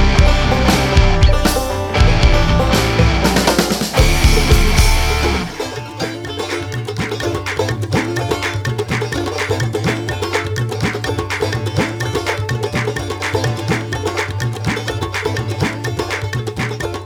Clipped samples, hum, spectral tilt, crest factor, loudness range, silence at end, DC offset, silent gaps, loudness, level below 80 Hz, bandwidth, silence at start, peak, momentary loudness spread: under 0.1%; none; -5 dB/octave; 16 dB; 6 LU; 0 s; under 0.1%; none; -17 LUFS; -20 dBFS; 18.5 kHz; 0 s; 0 dBFS; 9 LU